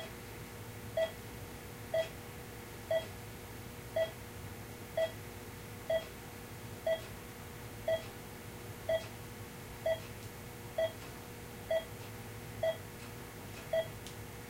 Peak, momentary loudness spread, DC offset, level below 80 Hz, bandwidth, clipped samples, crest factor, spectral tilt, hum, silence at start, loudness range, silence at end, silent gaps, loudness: -24 dBFS; 10 LU; under 0.1%; -58 dBFS; 16 kHz; under 0.1%; 18 dB; -4.5 dB/octave; none; 0 s; 1 LU; 0 s; none; -41 LUFS